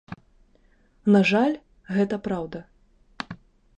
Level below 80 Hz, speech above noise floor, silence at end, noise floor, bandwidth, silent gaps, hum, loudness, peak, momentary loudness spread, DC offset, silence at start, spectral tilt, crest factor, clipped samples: -58 dBFS; 38 dB; 0.4 s; -60 dBFS; 8.6 kHz; none; none; -23 LUFS; -6 dBFS; 24 LU; under 0.1%; 0.1 s; -7 dB/octave; 20 dB; under 0.1%